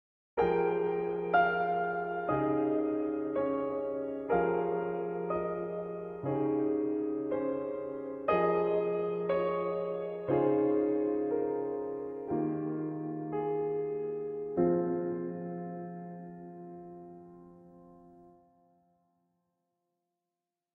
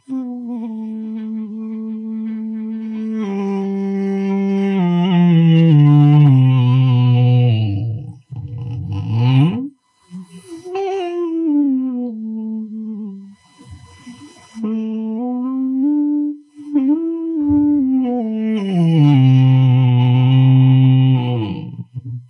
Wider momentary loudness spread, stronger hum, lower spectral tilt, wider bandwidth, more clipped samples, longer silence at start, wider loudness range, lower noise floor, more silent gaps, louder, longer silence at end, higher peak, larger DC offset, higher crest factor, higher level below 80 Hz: second, 11 LU vs 16 LU; neither; about the same, -10.5 dB/octave vs -9.5 dB/octave; about the same, 4.6 kHz vs 4.4 kHz; neither; first, 0.35 s vs 0.1 s; about the same, 10 LU vs 12 LU; first, -90 dBFS vs -41 dBFS; neither; second, -32 LUFS vs -16 LUFS; first, 2.45 s vs 0.05 s; second, -14 dBFS vs -2 dBFS; neither; about the same, 18 dB vs 14 dB; second, -66 dBFS vs -58 dBFS